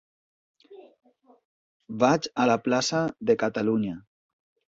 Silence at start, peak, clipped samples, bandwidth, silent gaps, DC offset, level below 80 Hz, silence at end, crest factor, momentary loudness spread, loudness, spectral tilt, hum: 0.7 s; -8 dBFS; under 0.1%; 8 kHz; 1.45-1.80 s; under 0.1%; -66 dBFS; 0.7 s; 20 dB; 9 LU; -25 LUFS; -5 dB/octave; none